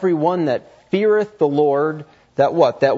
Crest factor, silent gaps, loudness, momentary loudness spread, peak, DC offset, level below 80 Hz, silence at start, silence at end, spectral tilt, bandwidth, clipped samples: 14 dB; none; -18 LUFS; 9 LU; -2 dBFS; under 0.1%; -64 dBFS; 0 s; 0 s; -7.5 dB/octave; 7.4 kHz; under 0.1%